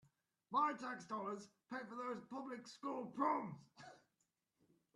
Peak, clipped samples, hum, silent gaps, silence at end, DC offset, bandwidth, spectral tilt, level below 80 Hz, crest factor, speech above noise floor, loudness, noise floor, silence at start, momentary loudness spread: -26 dBFS; under 0.1%; none; none; 1 s; under 0.1%; 12 kHz; -5.5 dB/octave; under -90 dBFS; 20 dB; 43 dB; -44 LUFS; -87 dBFS; 0.5 s; 16 LU